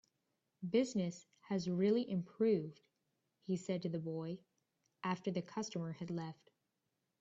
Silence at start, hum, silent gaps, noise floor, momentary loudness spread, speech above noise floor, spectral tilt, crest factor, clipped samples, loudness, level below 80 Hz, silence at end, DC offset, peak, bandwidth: 0.6 s; none; none; -87 dBFS; 14 LU; 48 dB; -6.5 dB/octave; 18 dB; under 0.1%; -39 LUFS; -80 dBFS; 0.9 s; under 0.1%; -22 dBFS; 8 kHz